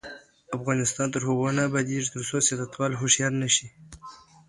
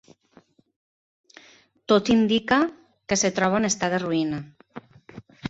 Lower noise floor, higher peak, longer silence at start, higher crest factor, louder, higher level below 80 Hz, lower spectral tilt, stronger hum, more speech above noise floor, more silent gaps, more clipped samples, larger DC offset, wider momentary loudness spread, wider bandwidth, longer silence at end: second, -48 dBFS vs -58 dBFS; about the same, -8 dBFS vs -6 dBFS; second, 0.05 s vs 1.9 s; about the same, 20 dB vs 20 dB; about the same, -25 LUFS vs -23 LUFS; about the same, -60 dBFS vs -58 dBFS; about the same, -3.5 dB/octave vs -4 dB/octave; neither; second, 22 dB vs 36 dB; neither; neither; neither; about the same, 22 LU vs 23 LU; first, 11.5 kHz vs 8 kHz; first, 0.3 s vs 0 s